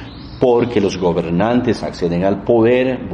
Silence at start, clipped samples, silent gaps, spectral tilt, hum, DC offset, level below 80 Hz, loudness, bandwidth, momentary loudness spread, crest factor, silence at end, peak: 0 s; under 0.1%; none; -7 dB/octave; none; under 0.1%; -40 dBFS; -16 LUFS; 10 kHz; 7 LU; 16 dB; 0 s; 0 dBFS